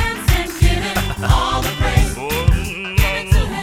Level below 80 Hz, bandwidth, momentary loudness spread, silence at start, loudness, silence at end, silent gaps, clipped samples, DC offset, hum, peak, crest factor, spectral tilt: -20 dBFS; 16.5 kHz; 4 LU; 0 s; -18 LUFS; 0 s; none; under 0.1%; under 0.1%; none; 0 dBFS; 16 dB; -4.5 dB/octave